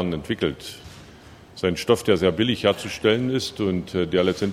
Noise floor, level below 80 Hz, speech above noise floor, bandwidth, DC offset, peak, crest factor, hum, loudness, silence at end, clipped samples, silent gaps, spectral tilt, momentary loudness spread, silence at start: -46 dBFS; -50 dBFS; 24 dB; 15.5 kHz; under 0.1%; -4 dBFS; 20 dB; none; -23 LUFS; 0 s; under 0.1%; none; -5.5 dB/octave; 16 LU; 0 s